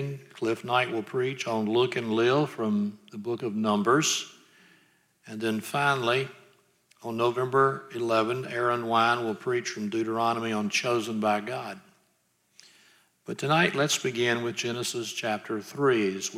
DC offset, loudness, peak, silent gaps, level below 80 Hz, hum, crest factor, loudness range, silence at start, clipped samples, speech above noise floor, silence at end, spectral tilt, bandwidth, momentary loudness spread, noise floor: under 0.1%; -27 LUFS; -8 dBFS; none; -78 dBFS; none; 20 dB; 3 LU; 0 s; under 0.1%; 43 dB; 0 s; -4 dB/octave; 16 kHz; 11 LU; -70 dBFS